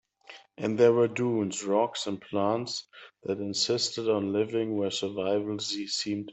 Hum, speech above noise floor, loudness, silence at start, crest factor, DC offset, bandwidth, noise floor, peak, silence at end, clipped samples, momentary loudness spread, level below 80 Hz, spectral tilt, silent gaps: none; 24 dB; -28 LUFS; 0.3 s; 20 dB; under 0.1%; 8.4 kHz; -52 dBFS; -10 dBFS; 0 s; under 0.1%; 11 LU; -74 dBFS; -4.5 dB/octave; none